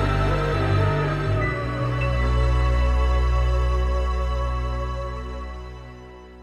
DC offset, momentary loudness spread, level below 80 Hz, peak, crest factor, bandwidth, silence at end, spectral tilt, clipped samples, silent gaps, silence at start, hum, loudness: under 0.1%; 14 LU; -24 dBFS; -10 dBFS; 12 dB; 8.4 kHz; 0 s; -7 dB/octave; under 0.1%; none; 0 s; none; -23 LUFS